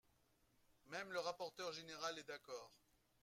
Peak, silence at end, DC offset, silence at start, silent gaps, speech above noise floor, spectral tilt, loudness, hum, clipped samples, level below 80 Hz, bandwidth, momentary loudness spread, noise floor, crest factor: -32 dBFS; 0.45 s; under 0.1%; 0.85 s; none; 29 dB; -2.5 dB/octave; -49 LUFS; none; under 0.1%; -86 dBFS; 16 kHz; 10 LU; -79 dBFS; 20 dB